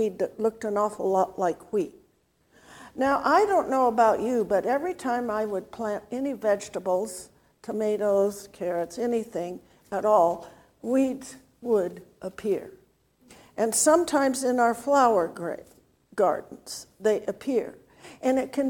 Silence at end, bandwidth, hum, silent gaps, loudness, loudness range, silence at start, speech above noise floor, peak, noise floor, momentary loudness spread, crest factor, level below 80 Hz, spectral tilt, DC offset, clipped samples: 0 s; 18 kHz; none; none; -26 LUFS; 5 LU; 0 s; 41 dB; -6 dBFS; -66 dBFS; 16 LU; 20 dB; -64 dBFS; -4 dB/octave; under 0.1%; under 0.1%